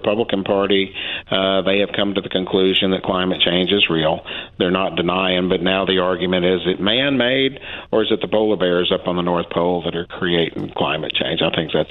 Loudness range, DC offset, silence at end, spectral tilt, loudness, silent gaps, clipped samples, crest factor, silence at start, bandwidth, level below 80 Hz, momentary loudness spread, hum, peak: 2 LU; under 0.1%; 0 s; -8.5 dB/octave; -18 LUFS; none; under 0.1%; 16 dB; 0 s; 4.5 kHz; -48 dBFS; 6 LU; none; -2 dBFS